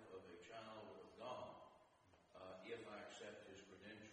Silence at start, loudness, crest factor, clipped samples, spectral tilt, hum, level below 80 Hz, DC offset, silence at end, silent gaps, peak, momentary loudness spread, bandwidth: 0 s; -57 LUFS; 20 dB; under 0.1%; -4 dB/octave; none; -88 dBFS; under 0.1%; 0 s; none; -38 dBFS; 8 LU; 9.6 kHz